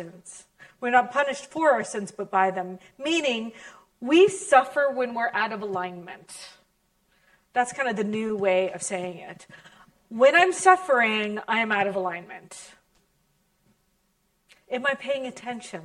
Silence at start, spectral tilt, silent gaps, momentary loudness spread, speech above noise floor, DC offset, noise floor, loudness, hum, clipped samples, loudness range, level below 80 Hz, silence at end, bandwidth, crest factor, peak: 0 s; -3.5 dB/octave; none; 22 LU; 46 dB; under 0.1%; -70 dBFS; -24 LUFS; none; under 0.1%; 9 LU; -72 dBFS; 0 s; 12 kHz; 24 dB; -2 dBFS